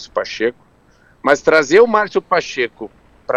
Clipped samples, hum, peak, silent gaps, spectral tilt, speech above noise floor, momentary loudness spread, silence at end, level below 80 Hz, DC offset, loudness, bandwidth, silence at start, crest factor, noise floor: under 0.1%; none; 0 dBFS; none; -4 dB/octave; 36 dB; 17 LU; 0 s; -54 dBFS; under 0.1%; -15 LUFS; 9.2 kHz; 0 s; 16 dB; -52 dBFS